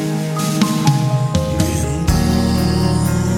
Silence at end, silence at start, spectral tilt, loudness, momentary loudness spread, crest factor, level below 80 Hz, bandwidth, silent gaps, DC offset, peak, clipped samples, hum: 0 s; 0 s; -6 dB/octave; -17 LUFS; 3 LU; 14 dB; -26 dBFS; 17 kHz; none; under 0.1%; -2 dBFS; under 0.1%; none